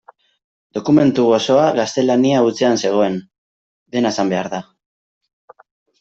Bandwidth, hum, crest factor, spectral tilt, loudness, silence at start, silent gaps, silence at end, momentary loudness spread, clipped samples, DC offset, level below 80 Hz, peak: 8 kHz; none; 14 dB; -5.5 dB/octave; -16 LUFS; 0.75 s; 3.38-3.86 s; 1.4 s; 12 LU; under 0.1%; under 0.1%; -60 dBFS; -2 dBFS